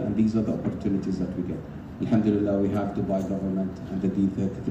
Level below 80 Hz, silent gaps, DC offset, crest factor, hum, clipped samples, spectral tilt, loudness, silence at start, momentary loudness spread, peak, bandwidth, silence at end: -48 dBFS; none; under 0.1%; 16 dB; none; under 0.1%; -9 dB/octave; -27 LUFS; 0 s; 8 LU; -10 dBFS; 8.2 kHz; 0 s